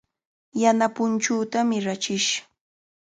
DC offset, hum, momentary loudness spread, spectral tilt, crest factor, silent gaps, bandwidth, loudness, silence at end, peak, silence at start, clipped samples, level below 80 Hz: under 0.1%; none; 6 LU; -3 dB/octave; 20 dB; none; 9.4 kHz; -23 LUFS; 0.65 s; -6 dBFS; 0.55 s; under 0.1%; -72 dBFS